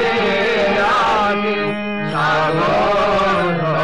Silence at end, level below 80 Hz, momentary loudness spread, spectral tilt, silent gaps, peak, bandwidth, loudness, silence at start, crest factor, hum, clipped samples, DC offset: 0 s; -42 dBFS; 5 LU; -5.5 dB/octave; none; -8 dBFS; 11 kHz; -16 LUFS; 0 s; 8 dB; none; under 0.1%; 1%